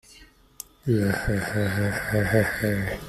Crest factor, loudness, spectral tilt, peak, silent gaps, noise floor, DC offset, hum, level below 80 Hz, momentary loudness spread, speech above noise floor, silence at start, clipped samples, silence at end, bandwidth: 20 dB; -25 LUFS; -6 dB/octave; -6 dBFS; none; -52 dBFS; under 0.1%; none; -42 dBFS; 9 LU; 28 dB; 0.15 s; under 0.1%; 0 s; 15 kHz